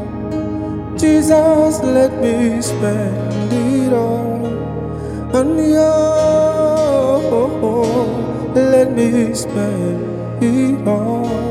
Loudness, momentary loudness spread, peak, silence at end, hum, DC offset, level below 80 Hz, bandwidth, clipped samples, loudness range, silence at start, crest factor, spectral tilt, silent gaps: -15 LUFS; 10 LU; 0 dBFS; 0 s; none; under 0.1%; -40 dBFS; 15.5 kHz; under 0.1%; 3 LU; 0 s; 14 dB; -6.5 dB/octave; none